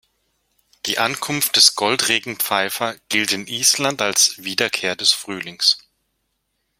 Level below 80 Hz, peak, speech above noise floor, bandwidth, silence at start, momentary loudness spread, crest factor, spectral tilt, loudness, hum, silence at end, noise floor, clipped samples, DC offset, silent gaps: -64 dBFS; 0 dBFS; 52 dB; 16.5 kHz; 0.85 s; 10 LU; 22 dB; -0.5 dB/octave; -17 LUFS; none; 1 s; -72 dBFS; under 0.1%; under 0.1%; none